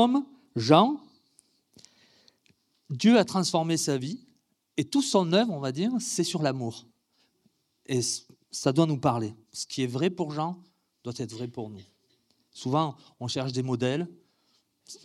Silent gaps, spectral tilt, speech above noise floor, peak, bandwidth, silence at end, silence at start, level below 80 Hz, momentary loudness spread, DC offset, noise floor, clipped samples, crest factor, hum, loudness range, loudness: none; -5 dB/octave; 44 dB; -4 dBFS; 14.5 kHz; 0.1 s; 0 s; -74 dBFS; 17 LU; under 0.1%; -71 dBFS; under 0.1%; 24 dB; none; 7 LU; -27 LUFS